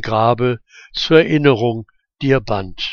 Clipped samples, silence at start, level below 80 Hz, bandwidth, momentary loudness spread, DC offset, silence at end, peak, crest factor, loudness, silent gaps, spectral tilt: under 0.1%; 0 s; -42 dBFS; 7 kHz; 13 LU; under 0.1%; 0 s; 0 dBFS; 16 dB; -16 LUFS; none; -6.5 dB/octave